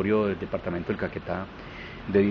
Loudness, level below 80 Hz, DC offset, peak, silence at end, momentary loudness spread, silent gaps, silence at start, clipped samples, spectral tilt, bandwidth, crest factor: -29 LUFS; -50 dBFS; under 0.1%; -10 dBFS; 0 s; 14 LU; none; 0 s; under 0.1%; -6.5 dB/octave; 6.2 kHz; 18 dB